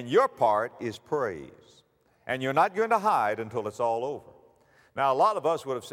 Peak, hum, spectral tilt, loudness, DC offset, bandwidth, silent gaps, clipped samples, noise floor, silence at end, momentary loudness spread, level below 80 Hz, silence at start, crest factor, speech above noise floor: -10 dBFS; none; -5.5 dB/octave; -27 LUFS; under 0.1%; 16 kHz; none; under 0.1%; -61 dBFS; 0 s; 13 LU; -72 dBFS; 0 s; 18 dB; 34 dB